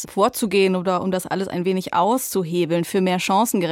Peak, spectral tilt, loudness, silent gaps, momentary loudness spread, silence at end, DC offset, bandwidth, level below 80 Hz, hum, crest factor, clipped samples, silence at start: -4 dBFS; -5 dB/octave; -20 LUFS; none; 5 LU; 0 s; under 0.1%; 17 kHz; -62 dBFS; none; 16 dB; under 0.1%; 0 s